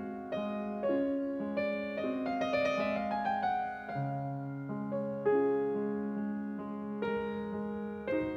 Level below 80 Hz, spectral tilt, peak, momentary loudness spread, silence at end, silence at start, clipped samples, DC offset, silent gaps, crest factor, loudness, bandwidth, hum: -66 dBFS; -7.5 dB/octave; -18 dBFS; 8 LU; 0 s; 0 s; under 0.1%; under 0.1%; none; 16 dB; -34 LUFS; 6.8 kHz; none